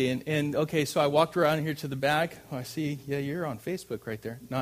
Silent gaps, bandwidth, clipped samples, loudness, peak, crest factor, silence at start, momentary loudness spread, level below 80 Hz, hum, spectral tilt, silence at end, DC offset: none; 15.5 kHz; under 0.1%; -29 LUFS; -10 dBFS; 18 dB; 0 s; 12 LU; -62 dBFS; none; -5.5 dB/octave; 0 s; under 0.1%